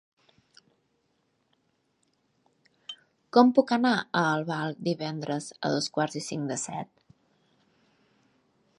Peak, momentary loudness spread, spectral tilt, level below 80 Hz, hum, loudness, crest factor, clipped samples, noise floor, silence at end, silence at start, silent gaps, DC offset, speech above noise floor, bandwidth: -4 dBFS; 22 LU; -5 dB/octave; -78 dBFS; none; -27 LUFS; 26 dB; under 0.1%; -73 dBFS; 1.95 s; 2.9 s; none; under 0.1%; 47 dB; 11.5 kHz